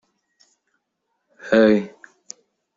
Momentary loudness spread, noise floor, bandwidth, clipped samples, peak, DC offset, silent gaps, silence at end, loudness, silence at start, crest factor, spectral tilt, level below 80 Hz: 26 LU; -75 dBFS; 7.8 kHz; under 0.1%; -4 dBFS; under 0.1%; none; 0.9 s; -18 LUFS; 1.45 s; 20 dB; -6 dB/octave; -64 dBFS